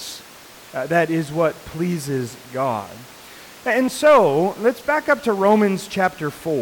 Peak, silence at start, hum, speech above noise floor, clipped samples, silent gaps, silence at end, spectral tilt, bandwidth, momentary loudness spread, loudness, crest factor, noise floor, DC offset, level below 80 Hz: -6 dBFS; 0 s; none; 24 dB; under 0.1%; none; 0 s; -5.5 dB/octave; 19 kHz; 19 LU; -20 LUFS; 14 dB; -43 dBFS; under 0.1%; -56 dBFS